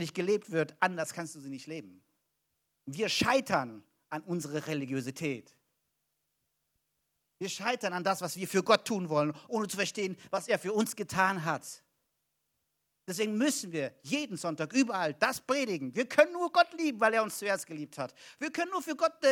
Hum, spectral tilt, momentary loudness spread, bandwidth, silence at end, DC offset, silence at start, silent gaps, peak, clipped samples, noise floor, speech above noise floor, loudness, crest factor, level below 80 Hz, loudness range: none; -4 dB/octave; 14 LU; 19.5 kHz; 0 s; under 0.1%; 0 s; none; -6 dBFS; under 0.1%; -81 dBFS; 50 dB; -31 LUFS; 26 dB; -74 dBFS; 8 LU